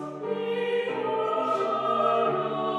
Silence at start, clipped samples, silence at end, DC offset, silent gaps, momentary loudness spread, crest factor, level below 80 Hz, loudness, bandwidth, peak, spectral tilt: 0 s; under 0.1%; 0 s; under 0.1%; none; 5 LU; 14 dB; -78 dBFS; -26 LUFS; 10.5 kHz; -12 dBFS; -6 dB/octave